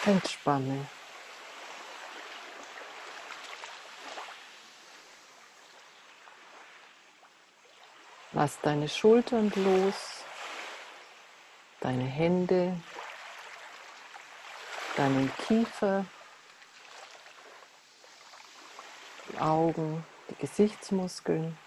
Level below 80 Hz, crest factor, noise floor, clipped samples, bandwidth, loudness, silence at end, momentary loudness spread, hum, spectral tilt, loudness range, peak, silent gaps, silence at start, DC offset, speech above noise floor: -70 dBFS; 22 dB; -59 dBFS; under 0.1%; 13.5 kHz; -30 LUFS; 0.1 s; 25 LU; none; -6 dB/octave; 19 LU; -12 dBFS; none; 0 s; under 0.1%; 31 dB